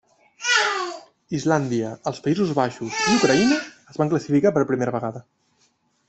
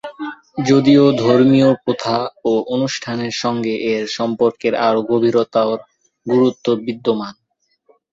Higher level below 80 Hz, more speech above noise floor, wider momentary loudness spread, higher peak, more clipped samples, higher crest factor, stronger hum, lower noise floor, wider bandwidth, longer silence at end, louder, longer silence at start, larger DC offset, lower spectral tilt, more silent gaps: about the same, -60 dBFS vs -58 dBFS; about the same, 44 dB vs 46 dB; about the same, 13 LU vs 11 LU; second, -4 dBFS vs 0 dBFS; neither; about the same, 18 dB vs 16 dB; neither; first, -65 dBFS vs -61 dBFS; about the same, 8.4 kHz vs 7.8 kHz; about the same, 0.9 s vs 0.8 s; second, -22 LUFS vs -16 LUFS; first, 0.4 s vs 0.05 s; neither; second, -4.5 dB/octave vs -6 dB/octave; neither